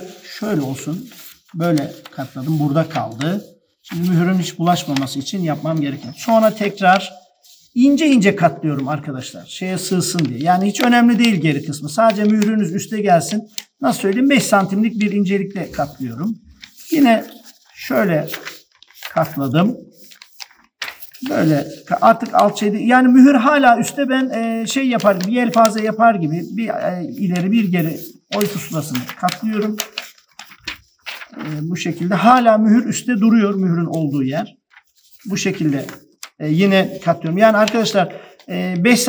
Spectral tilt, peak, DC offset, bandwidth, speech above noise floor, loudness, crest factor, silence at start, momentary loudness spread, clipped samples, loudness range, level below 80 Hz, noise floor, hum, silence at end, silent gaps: -5.5 dB/octave; 0 dBFS; under 0.1%; over 20 kHz; 36 dB; -17 LUFS; 16 dB; 0 s; 17 LU; under 0.1%; 8 LU; -62 dBFS; -52 dBFS; none; 0 s; none